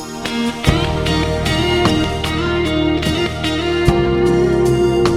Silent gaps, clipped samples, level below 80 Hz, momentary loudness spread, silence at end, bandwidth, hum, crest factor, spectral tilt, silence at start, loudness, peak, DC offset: none; under 0.1%; -28 dBFS; 4 LU; 0 s; 15 kHz; none; 16 dB; -5.5 dB/octave; 0 s; -16 LUFS; 0 dBFS; under 0.1%